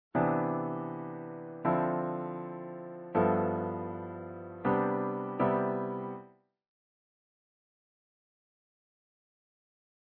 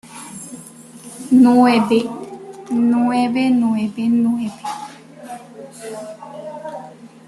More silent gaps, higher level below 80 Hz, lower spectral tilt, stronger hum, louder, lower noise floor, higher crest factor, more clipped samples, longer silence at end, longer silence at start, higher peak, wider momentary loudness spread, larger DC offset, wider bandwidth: neither; second, -70 dBFS vs -62 dBFS; first, -8.5 dB/octave vs -5.5 dB/octave; neither; second, -33 LUFS vs -16 LUFS; first, -54 dBFS vs -39 dBFS; about the same, 20 dB vs 16 dB; neither; first, 3.9 s vs 0.2 s; about the same, 0.15 s vs 0.05 s; second, -16 dBFS vs -2 dBFS; second, 13 LU vs 23 LU; neither; second, 4.3 kHz vs 12 kHz